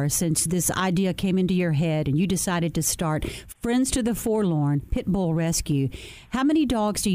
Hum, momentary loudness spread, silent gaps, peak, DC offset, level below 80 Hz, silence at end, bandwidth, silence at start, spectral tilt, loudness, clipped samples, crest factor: none; 5 LU; none; -10 dBFS; under 0.1%; -40 dBFS; 0 s; 16 kHz; 0 s; -5 dB/octave; -24 LUFS; under 0.1%; 14 dB